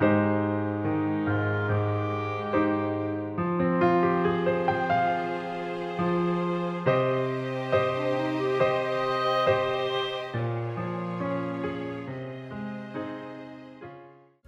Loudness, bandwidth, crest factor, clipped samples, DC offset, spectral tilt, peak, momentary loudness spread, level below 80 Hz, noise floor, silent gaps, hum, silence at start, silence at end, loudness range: -27 LUFS; 8.4 kHz; 18 dB; under 0.1%; under 0.1%; -8 dB/octave; -10 dBFS; 12 LU; -62 dBFS; -51 dBFS; none; none; 0 s; 0.35 s; 7 LU